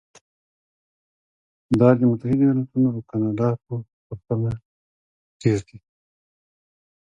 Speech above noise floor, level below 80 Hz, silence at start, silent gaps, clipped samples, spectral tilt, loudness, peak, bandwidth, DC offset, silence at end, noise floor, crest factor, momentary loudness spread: over 69 dB; -54 dBFS; 1.7 s; 3.93-4.10 s, 4.65-5.40 s; under 0.1%; -9 dB/octave; -22 LUFS; -2 dBFS; 8.8 kHz; under 0.1%; 1.25 s; under -90 dBFS; 22 dB; 16 LU